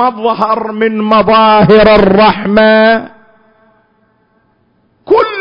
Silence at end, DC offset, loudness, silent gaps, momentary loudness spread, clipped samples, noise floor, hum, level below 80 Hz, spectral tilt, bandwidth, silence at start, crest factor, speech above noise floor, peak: 0 s; under 0.1%; -8 LUFS; none; 8 LU; 0.3%; -54 dBFS; none; -36 dBFS; -8.5 dB/octave; 5.4 kHz; 0 s; 10 dB; 47 dB; 0 dBFS